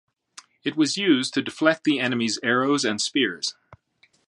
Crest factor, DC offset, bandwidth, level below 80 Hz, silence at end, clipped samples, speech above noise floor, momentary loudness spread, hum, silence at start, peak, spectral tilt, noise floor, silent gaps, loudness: 22 dB; under 0.1%; 11.5 kHz; -72 dBFS; 0.55 s; under 0.1%; 40 dB; 9 LU; none; 0.65 s; -2 dBFS; -3.5 dB/octave; -63 dBFS; none; -23 LUFS